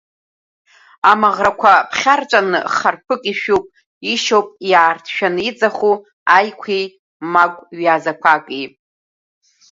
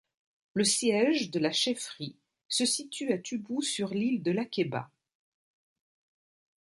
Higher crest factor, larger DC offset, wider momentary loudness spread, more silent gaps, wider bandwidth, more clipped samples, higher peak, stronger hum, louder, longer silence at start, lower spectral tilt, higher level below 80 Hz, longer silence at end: about the same, 16 dB vs 18 dB; neither; about the same, 9 LU vs 11 LU; first, 3.86-4.01 s, 6.13-6.26 s, 6.99-7.20 s vs 2.45-2.49 s; second, 7.8 kHz vs 11.5 kHz; neither; first, 0 dBFS vs -14 dBFS; neither; first, -15 LUFS vs -29 LUFS; first, 1.05 s vs 0.55 s; about the same, -3 dB/octave vs -3.5 dB/octave; first, -60 dBFS vs -76 dBFS; second, 1.05 s vs 1.8 s